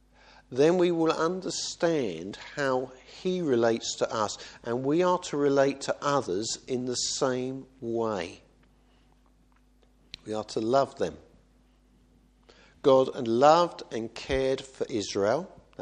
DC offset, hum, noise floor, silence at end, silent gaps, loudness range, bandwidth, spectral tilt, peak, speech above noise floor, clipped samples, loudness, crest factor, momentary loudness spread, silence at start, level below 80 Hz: under 0.1%; none; -62 dBFS; 0.35 s; none; 7 LU; 10 kHz; -4.5 dB/octave; -6 dBFS; 35 dB; under 0.1%; -28 LUFS; 22 dB; 13 LU; 0.5 s; -58 dBFS